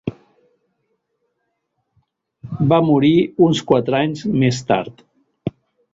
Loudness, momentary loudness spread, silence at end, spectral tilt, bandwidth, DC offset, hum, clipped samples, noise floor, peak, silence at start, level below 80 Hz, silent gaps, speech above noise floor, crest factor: -16 LUFS; 16 LU; 0.45 s; -7 dB/octave; 8 kHz; under 0.1%; none; under 0.1%; -73 dBFS; -2 dBFS; 0.05 s; -54 dBFS; none; 57 dB; 18 dB